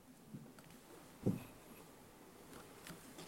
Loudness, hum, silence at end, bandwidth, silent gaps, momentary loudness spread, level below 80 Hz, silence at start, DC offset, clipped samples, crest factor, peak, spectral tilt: -50 LUFS; none; 0 s; 16 kHz; none; 17 LU; -72 dBFS; 0 s; under 0.1%; under 0.1%; 28 dB; -22 dBFS; -6 dB/octave